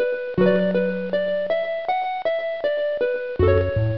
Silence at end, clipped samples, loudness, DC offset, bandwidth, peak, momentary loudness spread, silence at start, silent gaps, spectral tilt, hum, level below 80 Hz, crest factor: 0 s; under 0.1%; -22 LUFS; 0.6%; 5.8 kHz; -6 dBFS; 5 LU; 0 s; none; -9.5 dB/octave; none; -42 dBFS; 14 dB